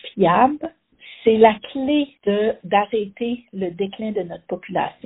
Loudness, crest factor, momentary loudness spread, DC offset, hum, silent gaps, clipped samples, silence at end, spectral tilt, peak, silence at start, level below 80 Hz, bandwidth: -20 LUFS; 20 dB; 13 LU; under 0.1%; none; none; under 0.1%; 0.15 s; -4 dB/octave; 0 dBFS; 0.05 s; -58 dBFS; 4 kHz